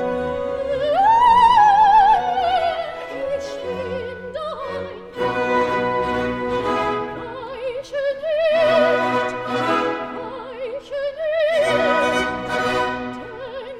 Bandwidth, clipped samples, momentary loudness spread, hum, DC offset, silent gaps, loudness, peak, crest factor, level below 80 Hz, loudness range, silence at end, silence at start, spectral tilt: 12.5 kHz; under 0.1%; 17 LU; none; under 0.1%; none; -19 LUFS; -4 dBFS; 16 dB; -48 dBFS; 8 LU; 0 s; 0 s; -4.5 dB/octave